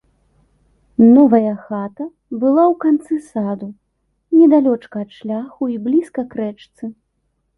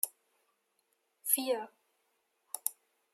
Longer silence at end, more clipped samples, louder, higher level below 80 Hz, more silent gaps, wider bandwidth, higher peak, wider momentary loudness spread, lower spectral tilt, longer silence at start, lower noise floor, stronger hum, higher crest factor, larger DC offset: first, 0.65 s vs 0.4 s; neither; first, -16 LUFS vs -34 LUFS; first, -60 dBFS vs under -90 dBFS; neither; second, 11 kHz vs 16 kHz; first, -2 dBFS vs -10 dBFS; first, 18 LU vs 14 LU; first, -9 dB/octave vs 0 dB/octave; first, 1 s vs 0.05 s; second, -68 dBFS vs -78 dBFS; neither; second, 16 dB vs 30 dB; neither